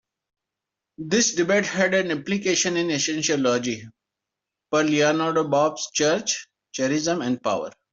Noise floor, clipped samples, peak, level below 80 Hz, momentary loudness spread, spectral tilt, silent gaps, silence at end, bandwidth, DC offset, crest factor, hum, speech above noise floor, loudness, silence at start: -86 dBFS; under 0.1%; -6 dBFS; -66 dBFS; 7 LU; -3 dB/octave; none; 0.2 s; 8 kHz; under 0.1%; 16 dB; none; 63 dB; -22 LUFS; 1 s